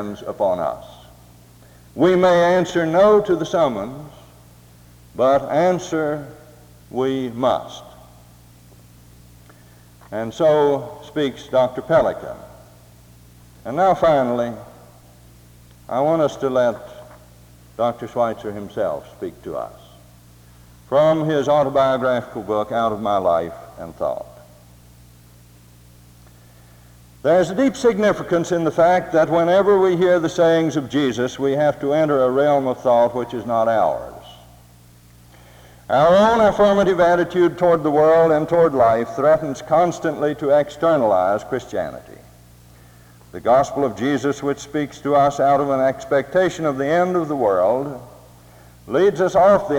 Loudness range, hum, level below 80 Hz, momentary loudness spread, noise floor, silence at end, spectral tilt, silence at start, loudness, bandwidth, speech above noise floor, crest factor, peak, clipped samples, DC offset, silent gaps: 9 LU; none; -50 dBFS; 15 LU; -48 dBFS; 0 s; -6 dB/octave; 0 s; -18 LUFS; 19.5 kHz; 30 dB; 16 dB; -4 dBFS; under 0.1%; under 0.1%; none